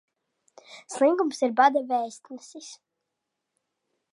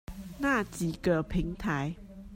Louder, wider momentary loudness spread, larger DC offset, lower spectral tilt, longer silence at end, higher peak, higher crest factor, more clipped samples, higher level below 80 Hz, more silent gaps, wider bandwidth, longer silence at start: first, -24 LUFS vs -31 LUFS; first, 22 LU vs 10 LU; neither; second, -3 dB/octave vs -6 dB/octave; first, 1.4 s vs 0 s; first, -6 dBFS vs -14 dBFS; first, 22 dB vs 16 dB; neither; second, -90 dBFS vs -44 dBFS; neither; second, 11.5 kHz vs 16 kHz; first, 0.7 s vs 0.1 s